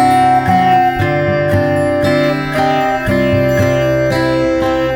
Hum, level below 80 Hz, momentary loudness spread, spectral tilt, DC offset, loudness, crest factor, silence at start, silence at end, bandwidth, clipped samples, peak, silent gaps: none; -34 dBFS; 3 LU; -6.5 dB/octave; 0.1%; -13 LUFS; 10 dB; 0 s; 0 s; 18 kHz; under 0.1%; -2 dBFS; none